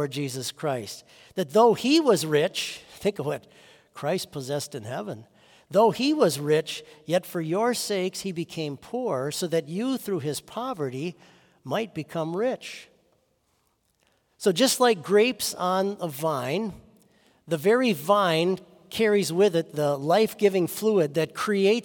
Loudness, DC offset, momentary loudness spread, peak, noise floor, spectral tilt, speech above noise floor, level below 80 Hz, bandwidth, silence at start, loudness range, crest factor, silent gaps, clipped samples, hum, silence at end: -25 LUFS; under 0.1%; 13 LU; -6 dBFS; -70 dBFS; -4.5 dB/octave; 45 dB; -70 dBFS; 18 kHz; 0 s; 8 LU; 18 dB; none; under 0.1%; none; 0 s